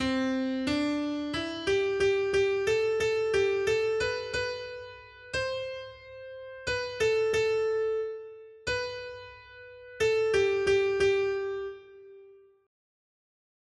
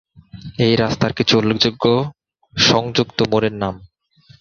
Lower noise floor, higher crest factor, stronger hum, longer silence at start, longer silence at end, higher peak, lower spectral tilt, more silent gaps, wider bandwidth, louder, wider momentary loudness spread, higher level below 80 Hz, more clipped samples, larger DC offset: first, -55 dBFS vs -51 dBFS; about the same, 14 dB vs 18 dB; neither; second, 0 s vs 0.35 s; first, 1.35 s vs 0.55 s; second, -14 dBFS vs -2 dBFS; about the same, -4 dB/octave vs -5 dB/octave; neither; first, 11.5 kHz vs 7.2 kHz; second, -29 LUFS vs -17 LUFS; first, 19 LU vs 15 LU; second, -56 dBFS vs -46 dBFS; neither; neither